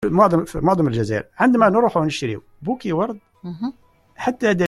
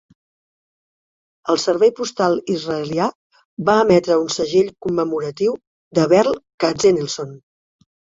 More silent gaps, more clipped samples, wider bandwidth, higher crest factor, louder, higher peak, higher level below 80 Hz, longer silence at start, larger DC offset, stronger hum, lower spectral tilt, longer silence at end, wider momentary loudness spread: second, none vs 3.15-3.30 s, 3.45-3.57 s, 5.67-5.91 s, 6.54-6.58 s; neither; first, 12.5 kHz vs 7.8 kHz; about the same, 18 dB vs 18 dB; about the same, -20 LUFS vs -18 LUFS; about the same, -2 dBFS vs -2 dBFS; first, -48 dBFS vs -58 dBFS; second, 0 s vs 1.45 s; neither; neither; first, -7 dB/octave vs -5 dB/octave; second, 0 s vs 0.8 s; first, 14 LU vs 9 LU